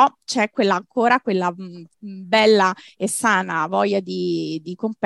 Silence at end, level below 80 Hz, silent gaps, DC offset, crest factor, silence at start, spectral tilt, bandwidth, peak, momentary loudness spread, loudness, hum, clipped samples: 0 s; -68 dBFS; none; under 0.1%; 18 dB; 0 s; -4 dB/octave; 13 kHz; -2 dBFS; 15 LU; -20 LUFS; none; under 0.1%